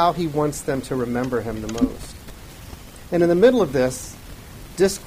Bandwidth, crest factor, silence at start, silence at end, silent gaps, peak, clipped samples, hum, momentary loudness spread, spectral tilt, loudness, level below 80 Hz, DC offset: 15.5 kHz; 18 dB; 0 s; 0 s; none; -4 dBFS; under 0.1%; none; 24 LU; -5.5 dB/octave; -21 LUFS; -42 dBFS; under 0.1%